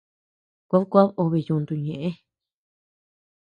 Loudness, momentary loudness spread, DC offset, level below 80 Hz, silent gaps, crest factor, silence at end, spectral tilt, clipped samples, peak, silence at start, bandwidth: -23 LUFS; 12 LU; under 0.1%; -66 dBFS; none; 22 dB; 1.3 s; -10.5 dB/octave; under 0.1%; -4 dBFS; 0.7 s; 5 kHz